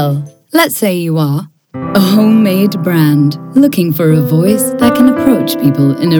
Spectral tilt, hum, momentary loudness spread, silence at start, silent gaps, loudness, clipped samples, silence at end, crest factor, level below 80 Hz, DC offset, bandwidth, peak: -6 dB/octave; none; 7 LU; 0 s; none; -11 LUFS; 0.5%; 0 s; 10 dB; -50 dBFS; under 0.1%; over 20 kHz; 0 dBFS